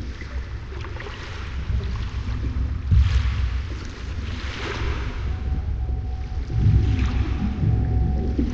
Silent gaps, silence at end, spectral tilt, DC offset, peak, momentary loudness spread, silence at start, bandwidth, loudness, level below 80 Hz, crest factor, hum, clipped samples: none; 0 s; -7.5 dB/octave; under 0.1%; -8 dBFS; 13 LU; 0 s; 7.2 kHz; -26 LUFS; -26 dBFS; 16 dB; none; under 0.1%